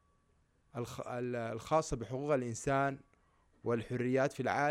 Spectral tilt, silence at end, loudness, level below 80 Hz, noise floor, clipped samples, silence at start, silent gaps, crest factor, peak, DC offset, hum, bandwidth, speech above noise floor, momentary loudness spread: -6 dB/octave; 0 s; -36 LUFS; -60 dBFS; -72 dBFS; under 0.1%; 0.75 s; none; 18 dB; -18 dBFS; under 0.1%; none; 15.5 kHz; 38 dB; 11 LU